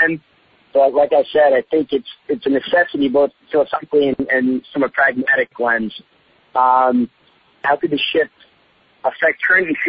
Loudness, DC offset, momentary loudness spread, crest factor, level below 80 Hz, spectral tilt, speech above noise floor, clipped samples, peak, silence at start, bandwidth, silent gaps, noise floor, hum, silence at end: -17 LUFS; under 0.1%; 10 LU; 14 dB; -58 dBFS; -8 dB/octave; 39 dB; under 0.1%; -2 dBFS; 0 s; 5.2 kHz; none; -56 dBFS; none; 0 s